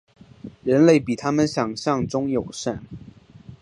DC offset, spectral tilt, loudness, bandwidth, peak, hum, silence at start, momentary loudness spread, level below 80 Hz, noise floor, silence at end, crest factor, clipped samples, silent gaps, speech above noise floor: under 0.1%; -6 dB/octave; -21 LUFS; 11 kHz; -2 dBFS; none; 0.45 s; 25 LU; -52 dBFS; -45 dBFS; 0.05 s; 20 dB; under 0.1%; none; 24 dB